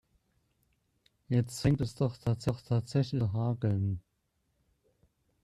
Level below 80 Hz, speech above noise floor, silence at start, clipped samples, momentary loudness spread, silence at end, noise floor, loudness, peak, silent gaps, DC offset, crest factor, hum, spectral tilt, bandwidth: -56 dBFS; 48 dB; 1.3 s; under 0.1%; 3 LU; 1.45 s; -78 dBFS; -32 LUFS; -14 dBFS; none; under 0.1%; 18 dB; none; -7.5 dB/octave; 13 kHz